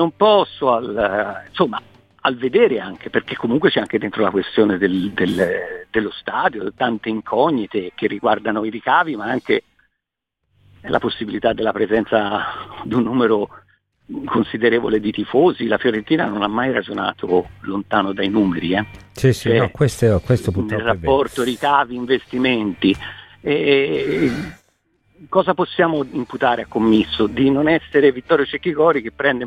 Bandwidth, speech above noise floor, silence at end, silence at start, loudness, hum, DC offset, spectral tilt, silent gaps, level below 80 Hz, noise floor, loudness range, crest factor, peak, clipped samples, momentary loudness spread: 14 kHz; 61 dB; 0 s; 0 s; -19 LUFS; none; under 0.1%; -6.5 dB/octave; none; -48 dBFS; -79 dBFS; 4 LU; 18 dB; 0 dBFS; under 0.1%; 7 LU